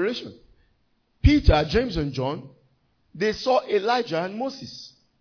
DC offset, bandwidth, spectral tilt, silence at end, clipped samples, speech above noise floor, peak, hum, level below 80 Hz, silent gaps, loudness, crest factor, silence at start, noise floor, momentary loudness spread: under 0.1%; 5.4 kHz; -6.5 dB/octave; 0.3 s; under 0.1%; 44 dB; -4 dBFS; none; -30 dBFS; none; -23 LUFS; 20 dB; 0 s; -67 dBFS; 18 LU